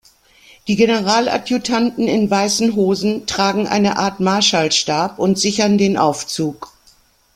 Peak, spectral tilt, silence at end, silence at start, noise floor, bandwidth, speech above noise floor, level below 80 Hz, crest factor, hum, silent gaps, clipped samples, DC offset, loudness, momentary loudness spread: 0 dBFS; -4 dB/octave; 0.7 s; 0.65 s; -53 dBFS; 14.5 kHz; 37 dB; -52 dBFS; 16 dB; none; none; under 0.1%; under 0.1%; -16 LUFS; 7 LU